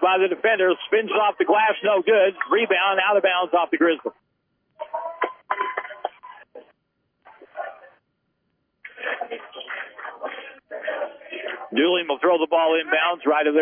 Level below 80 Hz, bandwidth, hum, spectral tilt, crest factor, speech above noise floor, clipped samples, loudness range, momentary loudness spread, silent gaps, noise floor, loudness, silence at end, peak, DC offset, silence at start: -82 dBFS; 3.6 kHz; none; -7 dB/octave; 16 dB; 53 dB; under 0.1%; 16 LU; 16 LU; none; -73 dBFS; -21 LUFS; 0 s; -6 dBFS; under 0.1%; 0 s